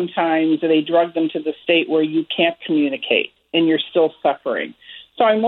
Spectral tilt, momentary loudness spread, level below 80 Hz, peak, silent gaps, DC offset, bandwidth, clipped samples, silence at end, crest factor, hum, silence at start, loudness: -8.5 dB/octave; 8 LU; -70 dBFS; -2 dBFS; none; under 0.1%; 4.2 kHz; under 0.1%; 0 s; 16 dB; none; 0 s; -19 LUFS